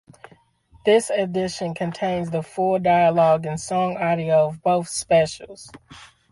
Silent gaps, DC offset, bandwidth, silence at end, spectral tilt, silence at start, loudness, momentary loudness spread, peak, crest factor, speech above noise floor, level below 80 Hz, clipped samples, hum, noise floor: none; under 0.1%; 11.5 kHz; 0.25 s; -5 dB/octave; 0.85 s; -21 LUFS; 10 LU; -6 dBFS; 16 dB; 35 dB; -56 dBFS; under 0.1%; none; -55 dBFS